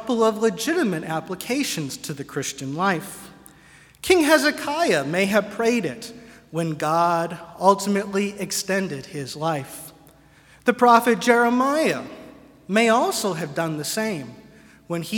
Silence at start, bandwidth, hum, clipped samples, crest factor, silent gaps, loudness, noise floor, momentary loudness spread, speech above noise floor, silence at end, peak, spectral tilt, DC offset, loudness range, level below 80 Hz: 0 s; 18 kHz; none; under 0.1%; 22 dB; none; -22 LUFS; -52 dBFS; 15 LU; 30 dB; 0 s; -2 dBFS; -4 dB/octave; under 0.1%; 5 LU; -60 dBFS